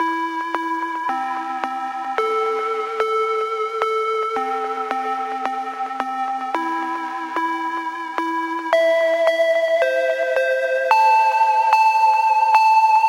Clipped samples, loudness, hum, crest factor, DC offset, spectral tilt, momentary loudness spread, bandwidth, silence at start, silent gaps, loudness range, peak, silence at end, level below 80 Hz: under 0.1%; -19 LUFS; none; 18 dB; under 0.1%; -1.5 dB/octave; 10 LU; 16.5 kHz; 0 s; none; 7 LU; -2 dBFS; 0 s; -76 dBFS